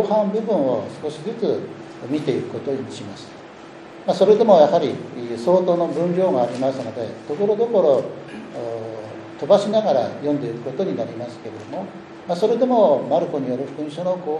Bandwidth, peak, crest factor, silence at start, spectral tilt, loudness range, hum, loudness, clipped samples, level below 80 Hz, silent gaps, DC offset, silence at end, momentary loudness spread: 10.5 kHz; -2 dBFS; 20 dB; 0 s; -7 dB/octave; 6 LU; none; -20 LUFS; under 0.1%; -68 dBFS; none; under 0.1%; 0 s; 18 LU